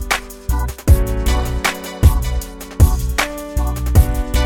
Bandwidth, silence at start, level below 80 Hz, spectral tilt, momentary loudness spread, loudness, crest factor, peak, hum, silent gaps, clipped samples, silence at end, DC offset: 18.5 kHz; 0 s; -18 dBFS; -5 dB/octave; 7 LU; -18 LUFS; 16 dB; 0 dBFS; none; none; under 0.1%; 0 s; under 0.1%